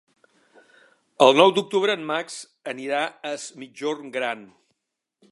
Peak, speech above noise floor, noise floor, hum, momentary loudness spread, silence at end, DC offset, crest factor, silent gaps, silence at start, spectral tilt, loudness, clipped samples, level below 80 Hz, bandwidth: -2 dBFS; 59 dB; -82 dBFS; none; 19 LU; 0.85 s; under 0.1%; 24 dB; none; 1.2 s; -3.5 dB/octave; -22 LUFS; under 0.1%; -82 dBFS; 11.5 kHz